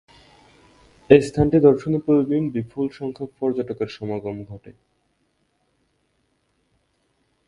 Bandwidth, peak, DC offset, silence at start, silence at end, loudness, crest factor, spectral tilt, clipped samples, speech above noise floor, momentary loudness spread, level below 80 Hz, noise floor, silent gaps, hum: 11 kHz; 0 dBFS; under 0.1%; 1.1 s; 2.75 s; -20 LUFS; 22 dB; -8 dB/octave; under 0.1%; 49 dB; 16 LU; -48 dBFS; -69 dBFS; none; none